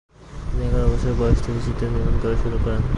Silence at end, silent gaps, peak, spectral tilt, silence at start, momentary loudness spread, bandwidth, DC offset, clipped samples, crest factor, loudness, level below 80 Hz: 0 s; none; -4 dBFS; -8 dB/octave; 0.2 s; 8 LU; 10.5 kHz; under 0.1%; under 0.1%; 16 dB; -23 LUFS; -24 dBFS